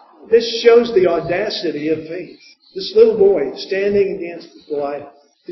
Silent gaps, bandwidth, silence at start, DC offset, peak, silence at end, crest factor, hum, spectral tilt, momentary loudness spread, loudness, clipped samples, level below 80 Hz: none; 6 kHz; 0.3 s; under 0.1%; 0 dBFS; 0 s; 16 dB; none; -5.5 dB/octave; 18 LU; -16 LUFS; under 0.1%; -54 dBFS